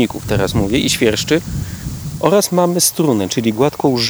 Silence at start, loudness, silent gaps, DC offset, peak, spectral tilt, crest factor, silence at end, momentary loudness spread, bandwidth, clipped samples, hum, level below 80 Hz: 0 s; -15 LUFS; none; under 0.1%; 0 dBFS; -4.5 dB/octave; 16 dB; 0 s; 11 LU; over 20 kHz; under 0.1%; none; -34 dBFS